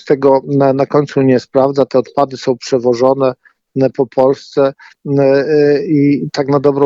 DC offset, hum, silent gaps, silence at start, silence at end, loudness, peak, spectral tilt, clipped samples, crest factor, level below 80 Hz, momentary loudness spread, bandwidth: under 0.1%; none; none; 0.05 s; 0 s; -13 LUFS; 0 dBFS; -7.5 dB/octave; under 0.1%; 12 dB; -56 dBFS; 5 LU; 7.6 kHz